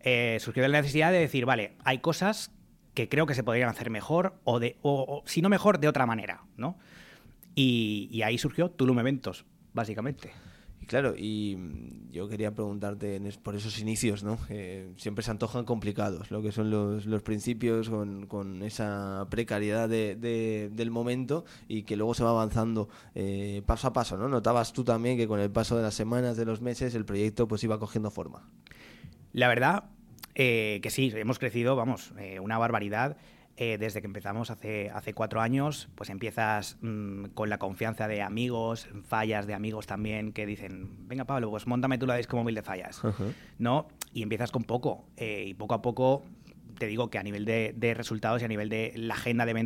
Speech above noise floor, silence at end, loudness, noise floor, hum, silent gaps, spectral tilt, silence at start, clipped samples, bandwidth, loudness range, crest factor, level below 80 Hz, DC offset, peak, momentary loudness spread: 24 dB; 0 s; -30 LUFS; -54 dBFS; none; none; -6 dB/octave; 0.05 s; under 0.1%; 16.5 kHz; 5 LU; 22 dB; -52 dBFS; under 0.1%; -8 dBFS; 11 LU